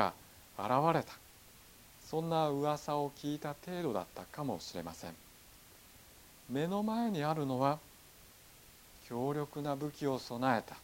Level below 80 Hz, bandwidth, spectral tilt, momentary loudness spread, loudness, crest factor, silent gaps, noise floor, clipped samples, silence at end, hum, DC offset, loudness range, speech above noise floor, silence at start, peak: -68 dBFS; 17 kHz; -6 dB/octave; 23 LU; -36 LUFS; 24 dB; none; -59 dBFS; under 0.1%; 0 s; none; under 0.1%; 6 LU; 23 dB; 0 s; -14 dBFS